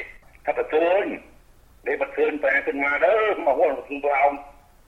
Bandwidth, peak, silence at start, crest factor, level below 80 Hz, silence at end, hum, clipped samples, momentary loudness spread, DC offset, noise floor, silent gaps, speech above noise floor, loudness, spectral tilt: 7.6 kHz; -6 dBFS; 0 s; 16 dB; -54 dBFS; 0.35 s; none; under 0.1%; 13 LU; under 0.1%; -52 dBFS; none; 30 dB; -22 LUFS; -5 dB/octave